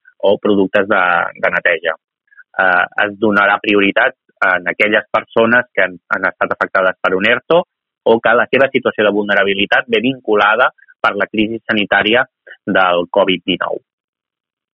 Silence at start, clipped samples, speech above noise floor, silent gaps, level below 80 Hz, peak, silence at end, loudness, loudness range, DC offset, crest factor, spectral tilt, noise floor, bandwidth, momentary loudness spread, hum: 0.25 s; under 0.1%; 30 dB; 2.04-2.08 s; -54 dBFS; 0 dBFS; 0.95 s; -14 LUFS; 2 LU; under 0.1%; 14 dB; -1.5 dB/octave; -44 dBFS; 7.2 kHz; 6 LU; none